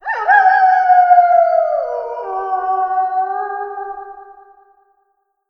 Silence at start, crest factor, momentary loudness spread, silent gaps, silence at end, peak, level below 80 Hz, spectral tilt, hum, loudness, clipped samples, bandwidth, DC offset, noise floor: 0.05 s; 16 dB; 16 LU; none; 1.2 s; 0 dBFS; -60 dBFS; -3 dB/octave; none; -14 LUFS; under 0.1%; 5.8 kHz; under 0.1%; -65 dBFS